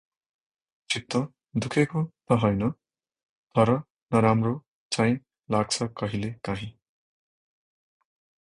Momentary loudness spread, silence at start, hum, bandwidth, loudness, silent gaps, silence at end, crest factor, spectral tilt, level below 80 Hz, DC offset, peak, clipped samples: 10 LU; 0.9 s; none; 11 kHz; -27 LUFS; 3.25-3.47 s, 3.90-3.95 s, 4.68-4.90 s; 1.75 s; 22 dB; -6 dB/octave; -56 dBFS; under 0.1%; -6 dBFS; under 0.1%